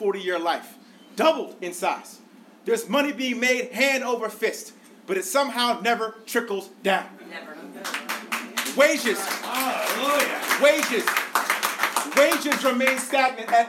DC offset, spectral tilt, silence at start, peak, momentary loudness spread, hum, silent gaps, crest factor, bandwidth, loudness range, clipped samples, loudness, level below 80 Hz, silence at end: under 0.1%; -2 dB/octave; 0 s; -6 dBFS; 12 LU; none; none; 18 dB; 17 kHz; 5 LU; under 0.1%; -23 LUFS; -78 dBFS; 0 s